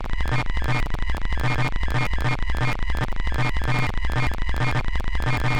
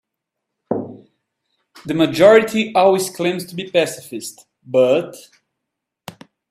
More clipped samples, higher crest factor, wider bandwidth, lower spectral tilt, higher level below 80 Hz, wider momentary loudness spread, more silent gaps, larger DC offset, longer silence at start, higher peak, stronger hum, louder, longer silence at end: neither; second, 6 dB vs 18 dB; second, 10.5 kHz vs 15.5 kHz; first, -6 dB/octave vs -4.5 dB/octave; first, -26 dBFS vs -62 dBFS; second, 3 LU vs 20 LU; neither; first, 1% vs under 0.1%; second, 0 s vs 0.7 s; second, -14 dBFS vs 0 dBFS; neither; second, -26 LUFS vs -16 LUFS; second, 0 s vs 1.3 s